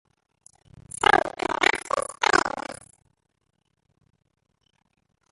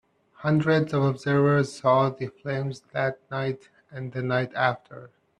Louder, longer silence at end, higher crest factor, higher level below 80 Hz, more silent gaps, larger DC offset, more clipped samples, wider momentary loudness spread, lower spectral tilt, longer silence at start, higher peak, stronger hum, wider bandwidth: about the same, -23 LUFS vs -25 LUFS; first, 2.6 s vs 0.35 s; first, 24 dB vs 18 dB; first, -58 dBFS vs -64 dBFS; neither; neither; neither; about the same, 18 LU vs 16 LU; second, -2 dB/octave vs -7.5 dB/octave; first, 1 s vs 0.4 s; first, -4 dBFS vs -8 dBFS; neither; first, 11.5 kHz vs 10 kHz